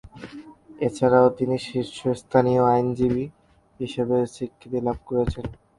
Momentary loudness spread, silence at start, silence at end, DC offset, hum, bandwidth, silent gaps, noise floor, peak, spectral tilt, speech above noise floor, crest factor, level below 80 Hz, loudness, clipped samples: 16 LU; 0.15 s; 0.25 s; under 0.1%; none; 11.5 kHz; none; -43 dBFS; -4 dBFS; -7.5 dB/octave; 21 dB; 20 dB; -46 dBFS; -23 LUFS; under 0.1%